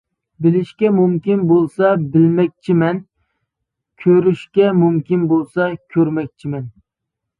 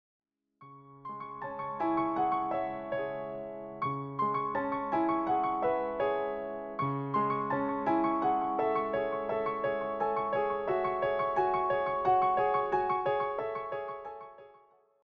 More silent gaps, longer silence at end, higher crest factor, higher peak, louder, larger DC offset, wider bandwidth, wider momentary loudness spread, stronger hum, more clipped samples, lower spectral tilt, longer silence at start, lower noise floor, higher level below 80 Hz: neither; first, 0.7 s vs 0.55 s; about the same, 14 dB vs 14 dB; first, -2 dBFS vs -18 dBFS; first, -16 LUFS vs -31 LUFS; neither; second, 4.8 kHz vs 6 kHz; about the same, 10 LU vs 10 LU; neither; neither; first, -10 dB/octave vs -8.5 dB/octave; second, 0.4 s vs 0.6 s; first, -80 dBFS vs -63 dBFS; first, -58 dBFS vs -64 dBFS